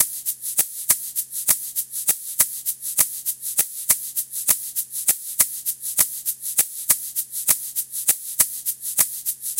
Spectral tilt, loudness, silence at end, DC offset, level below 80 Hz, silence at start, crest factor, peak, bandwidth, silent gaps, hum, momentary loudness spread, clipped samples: 1.5 dB/octave; -21 LUFS; 0 s; under 0.1%; -60 dBFS; 0 s; 24 dB; 0 dBFS; 17.5 kHz; none; none; 6 LU; under 0.1%